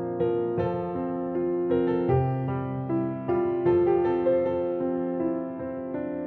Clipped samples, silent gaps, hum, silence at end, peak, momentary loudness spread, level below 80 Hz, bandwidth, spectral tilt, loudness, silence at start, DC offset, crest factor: under 0.1%; none; none; 0 s; -12 dBFS; 8 LU; -54 dBFS; 4.3 kHz; -11.5 dB/octave; -27 LUFS; 0 s; under 0.1%; 14 dB